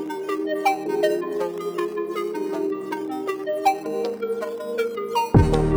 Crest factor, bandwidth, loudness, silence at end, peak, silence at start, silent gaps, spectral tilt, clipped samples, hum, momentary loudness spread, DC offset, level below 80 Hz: 22 dB; over 20 kHz; -24 LUFS; 0 s; -2 dBFS; 0 s; none; -7 dB/octave; under 0.1%; none; 9 LU; under 0.1%; -36 dBFS